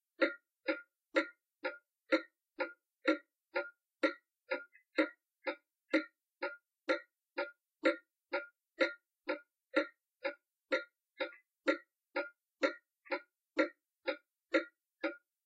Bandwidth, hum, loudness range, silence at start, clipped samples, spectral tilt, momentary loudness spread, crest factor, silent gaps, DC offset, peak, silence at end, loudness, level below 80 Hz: 9 kHz; none; 2 LU; 0.2 s; under 0.1%; -2 dB/octave; 10 LU; 22 dB; none; under 0.1%; -18 dBFS; 0.3 s; -39 LUFS; under -90 dBFS